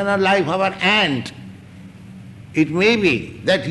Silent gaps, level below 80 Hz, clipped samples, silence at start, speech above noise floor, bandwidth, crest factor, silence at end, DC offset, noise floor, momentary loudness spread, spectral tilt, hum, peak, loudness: none; -52 dBFS; under 0.1%; 0 s; 22 dB; 12 kHz; 14 dB; 0 s; under 0.1%; -39 dBFS; 11 LU; -5 dB/octave; none; -4 dBFS; -17 LUFS